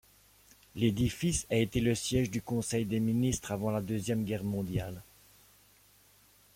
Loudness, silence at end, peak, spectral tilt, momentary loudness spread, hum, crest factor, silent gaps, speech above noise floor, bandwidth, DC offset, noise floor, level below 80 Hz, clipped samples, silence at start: -32 LUFS; 1.55 s; -14 dBFS; -5.5 dB/octave; 6 LU; 50 Hz at -55 dBFS; 18 dB; none; 32 dB; 16.5 kHz; under 0.1%; -63 dBFS; -52 dBFS; under 0.1%; 0.75 s